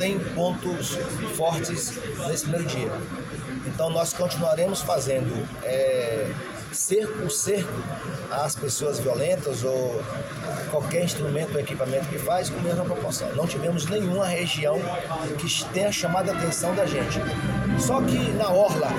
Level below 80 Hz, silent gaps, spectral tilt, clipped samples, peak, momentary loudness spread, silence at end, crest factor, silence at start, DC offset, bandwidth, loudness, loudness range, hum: -48 dBFS; none; -4.5 dB/octave; under 0.1%; -10 dBFS; 7 LU; 0 s; 16 dB; 0 s; under 0.1%; 17 kHz; -26 LUFS; 3 LU; none